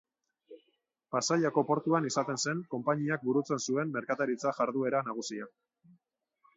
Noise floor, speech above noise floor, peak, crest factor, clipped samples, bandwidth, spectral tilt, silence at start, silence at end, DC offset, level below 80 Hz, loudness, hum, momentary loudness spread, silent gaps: -77 dBFS; 46 dB; -14 dBFS; 18 dB; under 0.1%; 8 kHz; -4.5 dB/octave; 0.5 s; 1.1 s; under 0.1%; -80 dBFS; -31 LUFS; none; 8 LU; none